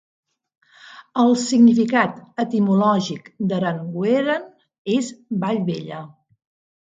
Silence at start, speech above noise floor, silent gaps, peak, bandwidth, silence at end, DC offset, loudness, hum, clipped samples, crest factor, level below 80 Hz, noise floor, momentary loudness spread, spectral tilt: 0.85 s; 26 dB; 4.78-4.85 s; -2 dBFS; 7.8 kHz; 0.9 s; under 0.1%; -20 LUFS; none; under 0.1%; 18 dB; -68 dBFS; -45 dBFS; 14 LU; -6 dB/octave